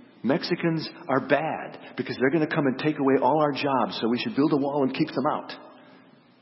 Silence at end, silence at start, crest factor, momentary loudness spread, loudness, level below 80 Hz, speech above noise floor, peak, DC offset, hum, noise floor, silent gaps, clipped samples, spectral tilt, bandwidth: 0.65 s; 0.25 s; 20 dB; 10 LU; -25 LUFS; -74 dBFS; 29 dB; -6 dBFS; under 0.1%; none; -54 dBFS; none; under 0.1%; -10 dB/octave; 5.8 kHz